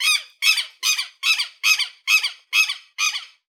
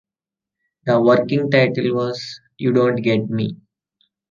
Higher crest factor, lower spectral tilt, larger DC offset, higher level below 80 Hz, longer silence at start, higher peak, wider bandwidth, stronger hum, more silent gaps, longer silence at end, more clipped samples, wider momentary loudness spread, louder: about the same, 18 dB vs 18 dB; second, 10 dB/octave vs -7.5 dB/octave; neither; second, under -90 dBFS vs -62 dBFS; second, 0 s vs 0.85 s; about the same, -4 dBFS vs -2 dBFS; first, over 20 kHz vs 7.2 kHz; neither; neither; second, 0.25 s vs 0.75 s; neither; second, 4 LU vs 12 LU; about the same, -19 LUFS vs -18 LUFS